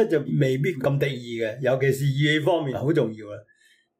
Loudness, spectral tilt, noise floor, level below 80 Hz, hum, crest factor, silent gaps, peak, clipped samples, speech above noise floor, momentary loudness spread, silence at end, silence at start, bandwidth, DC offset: -23 LUFS; -6.5 dB/octave; -61 dBFS; -62 dBFS; none; 14 dB; none; -10 dBFS; under 0.1%; 38 dB; 8 LU; 0.6 s; 0 s; 16 kHz; under 0.1%